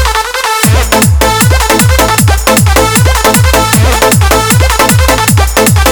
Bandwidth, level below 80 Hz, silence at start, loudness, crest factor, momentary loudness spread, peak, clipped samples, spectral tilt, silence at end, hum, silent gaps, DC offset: over 20 kHz; -14 dBFS; 0 s; -7 LUFS; 6 dB; 1 LU; 0 dBFS; 2%; -4 dB/octave; 0 s; none; none; 0.2%